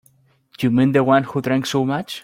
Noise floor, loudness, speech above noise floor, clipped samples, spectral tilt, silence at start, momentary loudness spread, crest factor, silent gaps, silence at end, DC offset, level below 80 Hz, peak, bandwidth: -58 dBFS; -18 LUFS; 40 dB; under 0.1%; -6.5 dB/octave; 0.6 s; 6 LU; 16 dB; none; 0.05 s; under 0.1%; -58 dBFS; -2 dBFS; 16 kHz